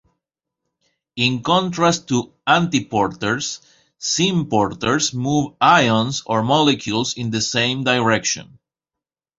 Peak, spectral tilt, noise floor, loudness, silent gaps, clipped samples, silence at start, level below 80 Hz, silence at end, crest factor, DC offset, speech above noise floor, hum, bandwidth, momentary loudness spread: -2 dBFS; -4 dB/octave; -87 dBFS; -18 LUFS; none; under 0.1%; 1.15 s; -54 dBFS; 0.95 s; 18 dB; under 0.1%; 69 dB; none; 8 kHz; 7 LU